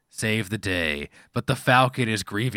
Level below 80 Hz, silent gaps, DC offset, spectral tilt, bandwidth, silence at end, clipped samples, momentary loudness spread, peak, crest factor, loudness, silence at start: -50 dBFS; none; under 0.1%; -5 dB/octave; 17 kHz; 0 s; under 0.1%; 11 LU; -4 dBFS; 20 dB; -24 LUFS; 0.15 s